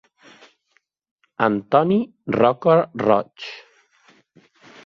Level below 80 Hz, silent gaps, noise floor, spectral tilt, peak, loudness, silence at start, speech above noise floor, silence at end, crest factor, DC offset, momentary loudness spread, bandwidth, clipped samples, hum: -62 dBFS; none; -67 dBFS; -8 dB/octave; -2 dBFS; -19 LUFS; 1.4 s; 48 dB; 1.25 s; 20 dB; under 0.1%; 17 LU; 7 kHz; under 0.1%; none